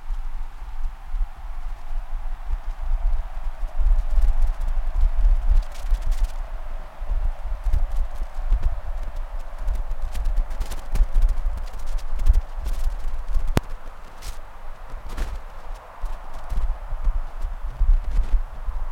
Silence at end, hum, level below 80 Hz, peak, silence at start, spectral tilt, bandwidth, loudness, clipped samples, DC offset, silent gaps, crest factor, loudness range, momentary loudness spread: 0 s; none; -22 dBFS; -2 dBFS; 0 s; -6 dB/octave; 7.2 kHz; -30 LUFS; under 0.1%; under 0.1%; none; 18 dB; 7 LU; 14 LU